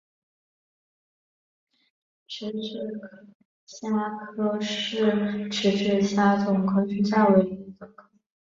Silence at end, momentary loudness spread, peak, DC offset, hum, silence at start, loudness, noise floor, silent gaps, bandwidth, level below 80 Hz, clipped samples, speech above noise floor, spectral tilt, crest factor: 0.6 s; 15 LU; -6 dBFS; under 0.1%; none; 2.3 s; -25 LUFS; under -90 dBFS; 3.35-3.67 s; 7.6 kHz; -66 dBFS; under 0.1%; over 66 dB; -6 dB/octave; 20 dB